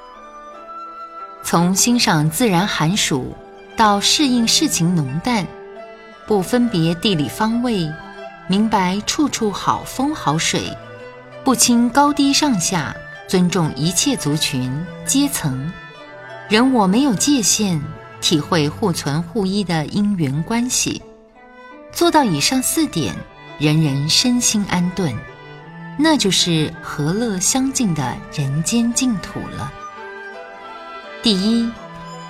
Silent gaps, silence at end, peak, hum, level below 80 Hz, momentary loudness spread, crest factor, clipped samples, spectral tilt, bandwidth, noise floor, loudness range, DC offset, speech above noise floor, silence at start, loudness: none; 0 s; 0 dBFS; none; -46 dBFS; 19 LU; 18 dB; under 0.1%; -4 dB/octave; 16.5 kHz; -43 dBFS; 4 LU; under 0.1%; 26 dB; 0 s; -17 LUFS